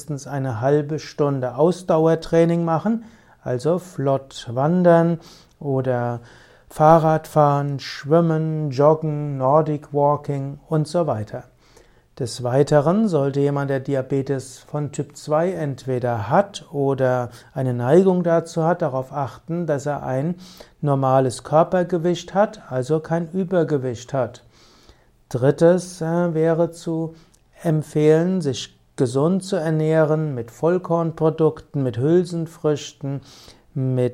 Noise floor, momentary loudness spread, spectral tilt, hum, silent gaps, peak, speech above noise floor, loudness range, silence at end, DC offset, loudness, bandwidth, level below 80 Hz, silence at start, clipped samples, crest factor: -53 dBFS; 11 LU; -7.5 dB/octave; none; none; 0 dBFS; 33 dB; 4 LU; 0 s; under 0.1%; -21 LUFS; 13.5 kHz; -56 dBFS; 0 s; under 0.1%; 20 dB